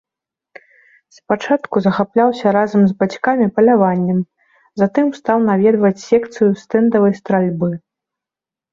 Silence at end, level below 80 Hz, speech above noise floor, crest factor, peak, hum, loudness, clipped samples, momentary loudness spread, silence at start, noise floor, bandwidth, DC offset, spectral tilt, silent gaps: 0.95 s; -58 dBFS; 73 dB; 14 dB; -2 dBFS; none; -15 LUFS; under 0.1%; 8 LU; 1.3 s; -88 dBFS; 7.4 kHz; under 0.1%; -8 dB/octave; none